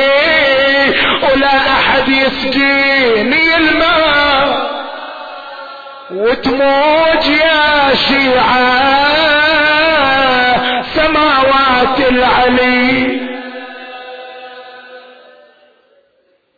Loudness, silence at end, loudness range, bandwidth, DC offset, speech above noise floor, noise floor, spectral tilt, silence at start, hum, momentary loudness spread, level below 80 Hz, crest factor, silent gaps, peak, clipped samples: -10 LUFS; 1.6 s; 5 LU; 5 kHz; under 0.1%; 46 dB; -57 dBFS; -5 dB/octave; 0 s; none; 18 LU; -38 dBFS; 10 dB; none; -2 dBFS; under 0.1%